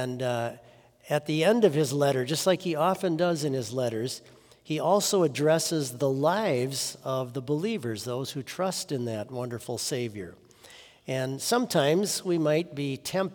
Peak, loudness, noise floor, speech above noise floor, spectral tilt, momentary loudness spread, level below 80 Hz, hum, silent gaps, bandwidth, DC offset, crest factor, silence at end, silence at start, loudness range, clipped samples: -8 dBFS; -27 LUFS; -52 dBFS; 25 dB; -4.5 dB/octave; 10 LU; -72 dBFS; none; none; over 20 kHz; under 0.1%; 20 dB; 0 s; 0 s; 6 LU; under 0.1%